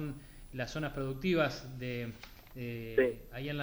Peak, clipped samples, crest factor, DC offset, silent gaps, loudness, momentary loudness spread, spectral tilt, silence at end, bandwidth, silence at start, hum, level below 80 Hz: -14 dBFS; under 0.1%; 22 dB; under 0.1%; none; -36 LUFS; 16 LU; -6.5 dB/octave; 0 s; over 20 kHz; 0 s; none; -52 dBFS